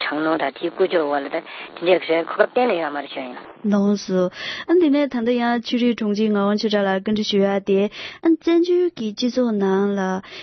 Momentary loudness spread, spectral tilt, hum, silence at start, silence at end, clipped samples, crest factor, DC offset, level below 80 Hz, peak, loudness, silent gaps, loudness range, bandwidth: 8 LU; -6 dB/octave; none; 0 s; 0 s; under 0.1%; 20 dB; under 0.1%; -64 dBFS; 0 dBFS; -20 LUFS; none; 2 LU; 6.4 kHz